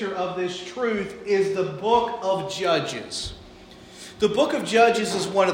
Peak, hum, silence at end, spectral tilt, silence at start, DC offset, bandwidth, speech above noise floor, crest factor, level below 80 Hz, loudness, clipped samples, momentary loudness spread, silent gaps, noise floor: -4 dBFS; none; 0 s; -4 dB/octave; 0 s; under 0.1%; 16 kHz; 22 dB; 18 dB; -54 dBFS; -23 LUFS; under 0.1%; 12 LU; none; -45 dBFS